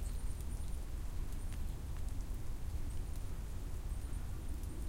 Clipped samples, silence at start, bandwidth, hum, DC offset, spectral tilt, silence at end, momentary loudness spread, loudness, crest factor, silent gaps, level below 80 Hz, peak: under 0.1%; 0 s; 16.5 kHz; none; under 0.1%; -5.5 dB/octave; 0 s; 2 LU; -46 LUFS; 12 dB; none; -42 dBFS; -28 dBFS